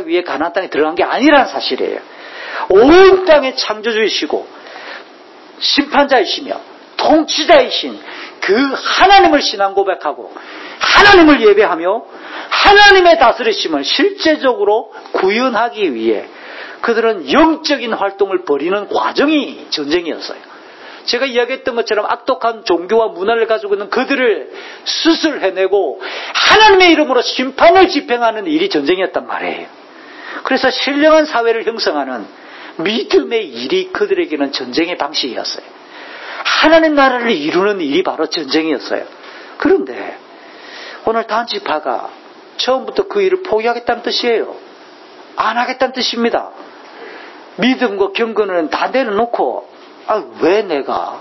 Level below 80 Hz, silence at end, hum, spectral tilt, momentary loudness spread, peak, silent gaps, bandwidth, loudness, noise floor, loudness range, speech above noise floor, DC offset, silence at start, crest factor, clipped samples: -46 dBFS; 0 s; none; -3.5 dB/octave; 20 LU; 0 dBFS; none; 8 kHz; -13 LUFS; -38 dBFS; 8 LU; 26 dB; under 0.1%; 0 s; 14 dB; under 0.1%